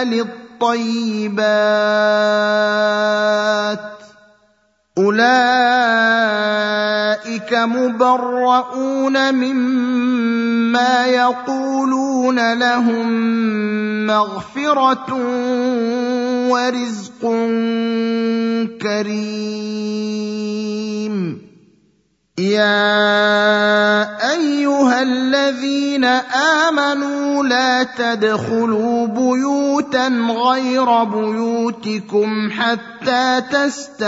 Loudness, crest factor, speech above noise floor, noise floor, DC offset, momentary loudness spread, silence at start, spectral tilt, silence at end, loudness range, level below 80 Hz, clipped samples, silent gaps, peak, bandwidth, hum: -16 LUFS; 16 dB; 44 dB; -61 dBFS; under 0.1%; 9 LU; 0 s; -4.5 dB/octave; 0 s; 5 LU; -68 dBFS; under 0.1%; none; 0 dBFS; 7.8 kHz; none